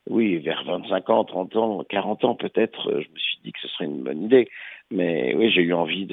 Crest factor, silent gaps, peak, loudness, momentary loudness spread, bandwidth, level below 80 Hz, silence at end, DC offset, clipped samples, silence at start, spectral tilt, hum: 20 dB; none; -4 dBFS; -23 LUFS; 10 LU; 4.1 kHz; -74 dBFS; 0 s; under 0.1%; under 0.1%; 0.05 s; -8.5 dB/octave; none